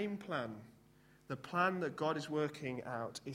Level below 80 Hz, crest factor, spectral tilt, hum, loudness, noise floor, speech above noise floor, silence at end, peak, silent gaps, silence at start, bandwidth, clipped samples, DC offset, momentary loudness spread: -76 dBFS; 20 dB; -5.5 dB/octave; none; -39 LUFS; -66 dBFS; 27 dB; 0 s; -20 dBFS; none; 0 s; 16.5 kHz; under 0.1%; under 0.1%; 12 LU